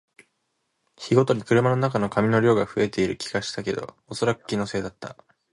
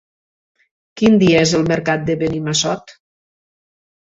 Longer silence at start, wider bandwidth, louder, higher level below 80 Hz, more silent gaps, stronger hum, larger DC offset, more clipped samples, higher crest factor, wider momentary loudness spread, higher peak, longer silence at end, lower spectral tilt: about the same, 1 s vs 0.95 s; first, 11.5 kHz vs 8.2 kHz; second, -23 LUFS vs -15 LUFS; second, -56 dBFS vs -48 dBFS; neither; neither; neither; neither; about the same, 20 dB vs 18 dB; first, 15 LU vs 8 LU; about the same, -4 dBFS vs -2 dBFS; second, 0.4 s vs 1.25 s; about the same, -6 dB/octave vs -5 dB/octave